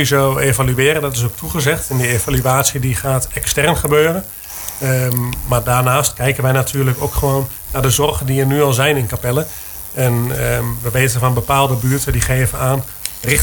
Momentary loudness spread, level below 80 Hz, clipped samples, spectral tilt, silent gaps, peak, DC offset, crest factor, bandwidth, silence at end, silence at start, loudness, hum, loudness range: 6 LU; -32 dBFS; under 0.1%; -4.5 dB/octave; none; 0 dBFS; under 0.1%; 16 dB; 19.5 kHz; 0 s; 0 s; -16 LUFS; none; 1 LU